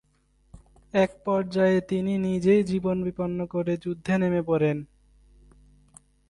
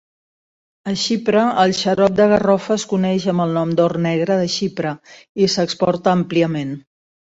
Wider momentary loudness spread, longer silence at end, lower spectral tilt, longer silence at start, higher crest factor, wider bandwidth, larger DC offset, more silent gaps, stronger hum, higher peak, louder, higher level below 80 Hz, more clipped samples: second, 7 LU vs 11 LU; first, 1.45 s vs 0.55 s; first, -8 dB/octave vs -5.5 dB/octave; second, 0.55 s vs 0.85 s; about the same, 16 dB vs 16 dB; first, 10.5 kHz vs 8 kHz; neither; second, none vs 5.29-5.35 s; neither; second, -10 dBFS vs -2 dBFS; second, -25 LUFS vs -17 LUFS; about the same, -56 dBFS vs -54 dBFS; neither